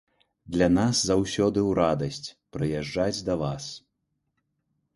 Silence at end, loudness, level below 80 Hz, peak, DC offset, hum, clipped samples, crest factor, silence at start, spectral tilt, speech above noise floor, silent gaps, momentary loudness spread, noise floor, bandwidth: 1.2 s; -26 LUFS; -48 dBFS; -8 dBFS; under 0.1%; none; under 0.1%; 18 dB; 0.45 s; -5 dB/octave; 53 dB; none; 15 LU; -78 dBFS; 11.5 kHz